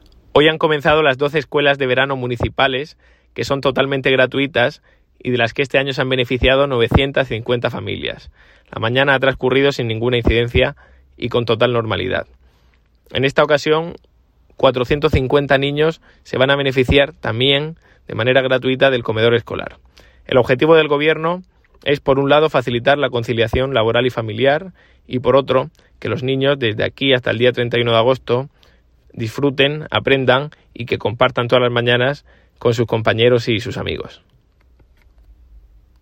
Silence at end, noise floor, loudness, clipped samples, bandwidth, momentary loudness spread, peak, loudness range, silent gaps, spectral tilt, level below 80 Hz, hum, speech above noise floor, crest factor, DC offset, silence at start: 1.9 s; -54 dBFS; -16 LUFS; under 0.1%; 16 kHz; 11 LU; 0 dBFS; 3 LU; none; -6.5 dB/octave; -38 dBFS; none; 38 dB; 16 dB; under 0.1%; 0.35 s